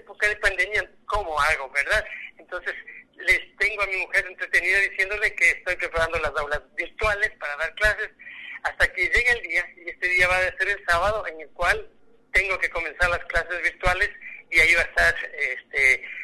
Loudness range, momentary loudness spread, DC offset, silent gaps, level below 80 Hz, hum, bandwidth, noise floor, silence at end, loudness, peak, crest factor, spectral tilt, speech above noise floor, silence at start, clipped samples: 3 LU; 12 LU; under 0.1%; none; -42 dBFS; none; 12.5 kHz; -50 dBFS; 0 s; -22 LUFS; -6 dBFS; 18 dB; -2.5 dB/octave; 26 dB; 0.1 s; under 0.1%